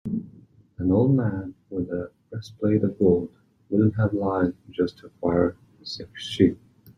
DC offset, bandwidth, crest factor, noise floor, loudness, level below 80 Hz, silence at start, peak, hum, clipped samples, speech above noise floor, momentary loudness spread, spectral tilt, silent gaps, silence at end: under 0.1%; 10 kHz; 20 dB; -52 dBFS; -25 LUFS; -56 dBFS; 0.05 s; -4 dBFS; none; under 0.1%; 29 dB; 15 LU; -8 dB/octave; none; 0.1 s